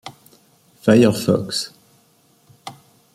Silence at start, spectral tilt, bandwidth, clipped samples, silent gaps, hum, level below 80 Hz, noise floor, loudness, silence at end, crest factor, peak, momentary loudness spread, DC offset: 0.05 s; -5.5 dB/octave; 15.5 kHz; under 0.1%; none; none; -58 dBFS; -57 dBFS; -17 LUFS; 0.45 s; 20 dB; -2 dBFS; 25 LU; under 0.1%